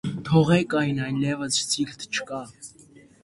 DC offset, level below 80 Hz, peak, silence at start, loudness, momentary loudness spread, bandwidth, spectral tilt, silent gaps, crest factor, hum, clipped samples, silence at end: under 0.1%; -56 dBFS; -6 dBFS; 0.05 s; -24 LUFS; 18 LU; 11.5 kHz; -4.5 dB/octave; none; 20 dB; none; under 0.1%; 0.55 s